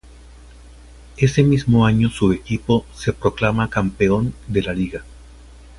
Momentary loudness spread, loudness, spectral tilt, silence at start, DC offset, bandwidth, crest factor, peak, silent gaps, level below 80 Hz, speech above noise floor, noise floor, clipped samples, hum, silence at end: 9 LU; -19 LUFS; -7 dB/octave; 1.15 s; under 0.1%; 11.5 kHz; 18 dB; -2 dBFS; none; -38 dBFS; 25 dB; -42 dBFS; under 0.1%; none; 0.65 s